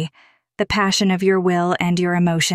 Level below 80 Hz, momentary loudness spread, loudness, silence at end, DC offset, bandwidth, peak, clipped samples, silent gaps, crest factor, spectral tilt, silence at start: -48 dBFS; 5 LU; -18 LUFS; 0 s; under 0.1%; 14.5 kHz; -6 dBFS; under 0.1%; none; 12 dB; -4.5 dB/octave; 0 s